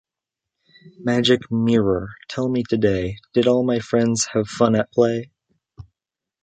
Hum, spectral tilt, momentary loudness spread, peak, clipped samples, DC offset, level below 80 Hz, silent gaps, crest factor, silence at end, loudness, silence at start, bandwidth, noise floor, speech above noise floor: none; -5 dB/octave; 8 LU; -4 dBFS; under 0.1%; under 0.1%; -48 dBFS; none; 18 dB; 0.6 s; -20 LUFS; 0.85 s; 9.2 kHz; -86 dBFS; 67 dB